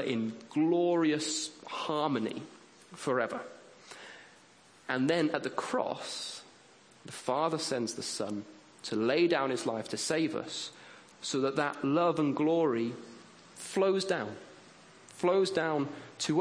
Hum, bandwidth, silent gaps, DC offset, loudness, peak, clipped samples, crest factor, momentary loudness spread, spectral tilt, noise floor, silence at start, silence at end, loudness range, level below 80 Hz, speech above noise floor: none; 10.5 kHz; none; under 0.1%; -32 LUFS; -14 dBFS; under 0.1%; 18 dB; 21 LU; -4.5 dB/octave; -59 dBFS; 0 s; 0 s; 4 LU; -78 dBFS; 28 dB